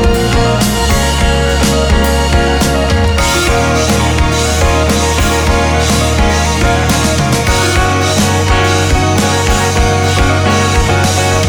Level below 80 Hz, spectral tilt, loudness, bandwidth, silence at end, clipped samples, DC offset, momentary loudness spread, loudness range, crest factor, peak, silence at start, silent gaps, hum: -16 dBFS; -4.5 dB/octave; -11 LUFS; over 20 kHz; 0 s; under 0.1%; under 0.1%; 1 LU; 0 LU; 10 dB; 0 dBFS; 0 s; none; none